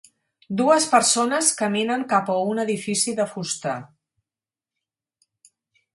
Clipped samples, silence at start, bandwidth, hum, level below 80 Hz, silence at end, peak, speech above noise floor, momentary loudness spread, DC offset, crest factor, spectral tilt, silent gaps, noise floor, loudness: under 0.1%; 0.5 s; 12 kHz; none; -70 dBFS; 2.1 s; -4 dBFS; over 69 dB; 10 LU; under 0.1%; 20 dB; -3 dB/octave; none; under -90 dBFS; -21 LUFS